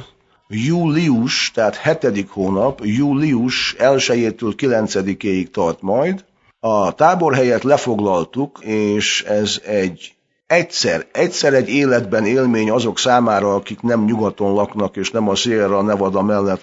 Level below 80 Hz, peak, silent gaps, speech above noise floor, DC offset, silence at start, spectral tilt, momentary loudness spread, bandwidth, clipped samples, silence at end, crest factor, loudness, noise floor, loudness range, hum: -54 dBFS; 0 dBFS; none; 29 dB; under 0.1%; 0 s; -5 dB/octave; 6 LU; 8 kHz; under 0.1%; 0.05 s; 16 dB; -17 LUFS; -46 dBFS; 2 LU; none